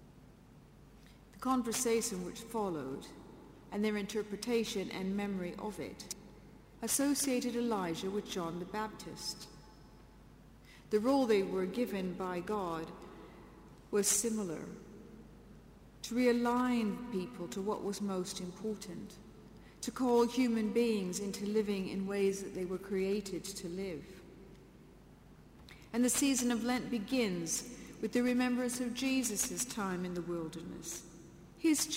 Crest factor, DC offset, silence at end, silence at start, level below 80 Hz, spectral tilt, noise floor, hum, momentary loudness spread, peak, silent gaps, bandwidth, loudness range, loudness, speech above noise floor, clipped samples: 18 dB; under 0.1%; 0 s; 0 s; -62 dBFS; -4 dB/octave; -58 dBFS; none; 21 LU; -18 dBFS; none; 16 kHz; 5 LU; -35 LUFS; 23 dB; under 0.1%